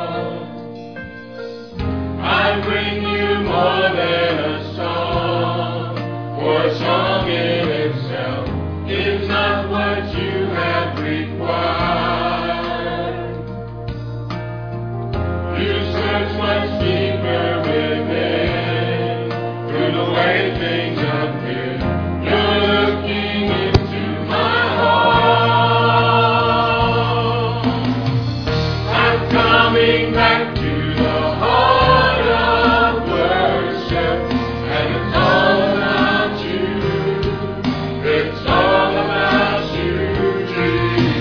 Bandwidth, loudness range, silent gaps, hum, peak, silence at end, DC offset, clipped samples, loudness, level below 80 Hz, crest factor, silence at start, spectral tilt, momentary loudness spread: 5.4 kHz; 6 LU; none; none; 0 dBFS; 0 s; 0.4%; under 0.1%; -17 LUFS; -34 dBFS; 16 dB; 0 s; -7.5 dB/octave; 10 LU